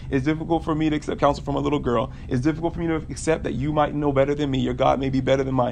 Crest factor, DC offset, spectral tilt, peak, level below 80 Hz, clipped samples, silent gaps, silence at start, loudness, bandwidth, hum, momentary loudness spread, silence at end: 18 dB; under 0.1%; -7 dB/octave; -4 dBFS; -38 dBFS; under 0.1%; none; 0 s; -23 LUFS; 10 kHz; none; 4 LU; 0 s